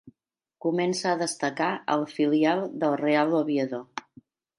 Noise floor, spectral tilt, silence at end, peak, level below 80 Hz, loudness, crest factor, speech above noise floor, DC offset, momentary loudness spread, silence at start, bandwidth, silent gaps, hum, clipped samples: -82 dBFS; -5 dB/octave; 0.6 s; -10 dBFS; -78 dBFS; -26 LUFS; 18 dB; 57 dB; under 0.1%; 9 LU; 0.05 s; 11.5 kHz; none; none; under 0.1%